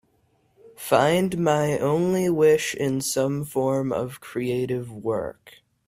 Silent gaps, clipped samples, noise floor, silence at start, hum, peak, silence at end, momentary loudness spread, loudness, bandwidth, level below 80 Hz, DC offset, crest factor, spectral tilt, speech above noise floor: none; under 0.1%; -65 dBFS; 0.65 s; none; -4 dBFS; 0.4 s; 10 LU; -23 LUFS; 16 kHz; -60 dBFS; under 0.1%; 20 dB; -5.5 dB/octave; 42 dB